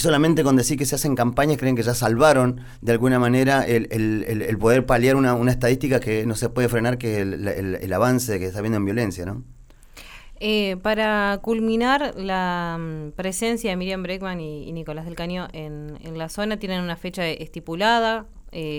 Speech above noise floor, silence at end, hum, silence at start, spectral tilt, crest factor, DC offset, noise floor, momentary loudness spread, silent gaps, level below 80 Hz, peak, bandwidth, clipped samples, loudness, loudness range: 23 dB; 0 s; none; 0 s; -5.5 dB/octave; 18 dB; under 0.1%; -45 dBFS; 14 LU; none; -42 dBFS; -4 dBFS; 20 kHz; under 0.1%; -22 LUFS; 9 LU